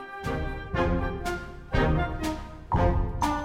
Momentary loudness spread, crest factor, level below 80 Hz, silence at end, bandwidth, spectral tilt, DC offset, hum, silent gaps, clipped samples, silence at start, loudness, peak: 8 LU; 18 dB; -32 dBFS; 0 s; 16 kHz; -6.5 dB/octave; under 0.1%; none; none; under 0.1%; 0 s; -29 LUFS; -10 dBFS